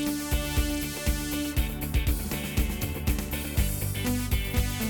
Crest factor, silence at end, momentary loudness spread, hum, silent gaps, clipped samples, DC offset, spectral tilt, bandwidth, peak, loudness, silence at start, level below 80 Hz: 16 dB; 0 s; 2 LU; none; none; under 0.1%; under 0.1%; -4.5 dB/octave; over 20 kHz; -12 dBFS; -29 LUFS; 0 s; -32 dBFS